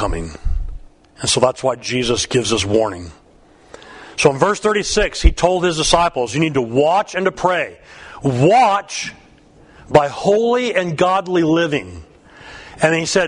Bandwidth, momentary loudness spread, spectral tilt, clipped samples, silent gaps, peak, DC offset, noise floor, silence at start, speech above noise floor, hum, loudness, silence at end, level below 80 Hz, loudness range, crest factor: 11 kHz; 14 LU; -4 dB/octave; under 0.1%; none; 0 dBFS; under 0.1%; -48 dBFS; 0 s; 32 dB; none; -17 LUFS; 0 s; -28 dBFS; 3 LU; 18 dB